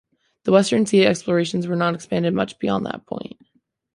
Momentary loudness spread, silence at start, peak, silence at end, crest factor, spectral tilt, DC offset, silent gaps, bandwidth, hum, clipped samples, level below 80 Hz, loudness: 14 LU; 0.45 s; -2 dBFS; 0.7 s; 18 dB; -5.5 dB/octave; under 0.1%; none; 11.5 kHz; none; under 0.1%; -60 dBFS; -20 LUFS